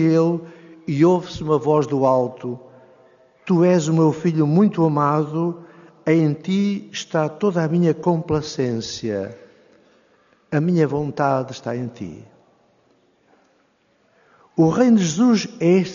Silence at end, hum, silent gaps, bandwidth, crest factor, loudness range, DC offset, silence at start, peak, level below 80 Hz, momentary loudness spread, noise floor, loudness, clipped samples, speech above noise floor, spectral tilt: 0 s; none; none; 7.4 kHz; 16 dB; 6 LU; under 0.1%; 0 s; -4 dBFS; -56 dBFS; 12 LU; -62 dBFS; -19 LUFS; under 0.1%; 43 dB; -7 dB/octave